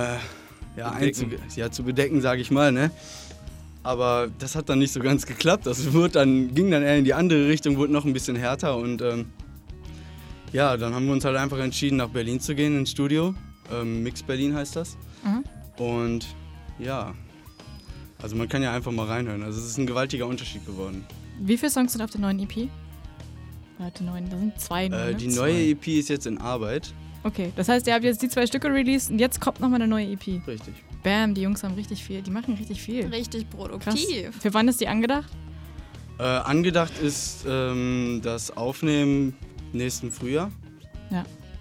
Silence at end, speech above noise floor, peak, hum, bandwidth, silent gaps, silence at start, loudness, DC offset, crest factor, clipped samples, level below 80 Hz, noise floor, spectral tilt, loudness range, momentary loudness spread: 0 s; 20 dB; -4 dBFS; none; 17 kHz; none; 0 s; -25 LUFS; under 0.1%; 22 dB; under 0.1%; -46 dBFS; -45 dBFS; -5 dB/octave; 8 LU; 20 LU